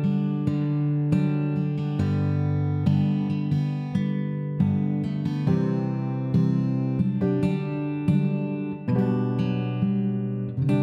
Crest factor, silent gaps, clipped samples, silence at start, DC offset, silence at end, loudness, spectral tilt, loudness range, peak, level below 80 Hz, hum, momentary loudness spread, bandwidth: 14 dB; none; under 0.1%; 0 s; under 0.1%; 0 s; -25 LUFS; -10 dB/octave; 1 LU; -10 dBFS; -56 dBFS; none; 4 LU; 5.8 kHz